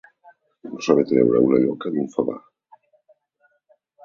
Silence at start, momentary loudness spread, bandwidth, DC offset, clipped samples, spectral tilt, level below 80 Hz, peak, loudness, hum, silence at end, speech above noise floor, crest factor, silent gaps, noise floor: 0.65 s; 21 LU; 7.4 kHz; under 0.1%; under 0.1%; -7 dB/octave; -64 dBFS; -2 dBFS; -20 LUFS; none; 1.65 s; 47 dB; 20 dB; none; -66 dBFS